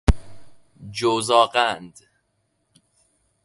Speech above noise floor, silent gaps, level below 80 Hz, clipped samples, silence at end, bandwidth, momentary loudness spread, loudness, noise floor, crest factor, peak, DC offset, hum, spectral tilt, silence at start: 50 dB; none; -30 dBFS; under 0.1%; 1.55 s; 11.5 kHz; 15 LU; -21 LUFS; -71 dBFS; 24 dB; 0 dBFS; under 0.1%; none; -4.5 dB/octave; 0.1 s